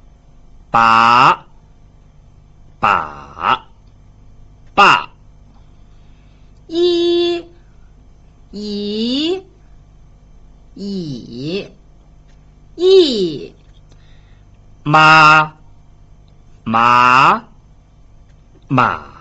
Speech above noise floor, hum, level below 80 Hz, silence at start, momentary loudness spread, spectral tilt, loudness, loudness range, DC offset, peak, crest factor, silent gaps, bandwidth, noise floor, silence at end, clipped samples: 35 dB; 50 Hz at -45 dBFS; -44 dBFS; 0.75 s; 19 LU; -5 dB/octave; -13 LUFS; 12 LU; under 0.1%; 0 dBFS; 16 dB; none; 8.2 kHz; -45 dBFS; 0.15 s; under 0.1%